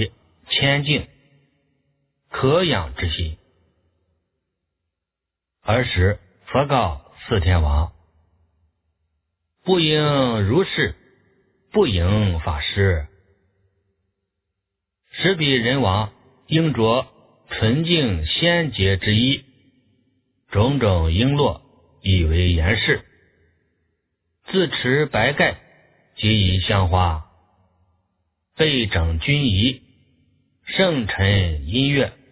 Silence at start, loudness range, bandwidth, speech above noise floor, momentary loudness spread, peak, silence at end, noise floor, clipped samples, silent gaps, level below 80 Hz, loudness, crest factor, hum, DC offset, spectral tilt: 0 s; 5 LU; 4 kHz; 66 dB; 9 LU; -2 dBFS; 0.2 s; -85 dBFS; under 0.1%; none; -32 dBFS; -20 LUFS; 18 dB; none; under 0.1%; -10 dB/octave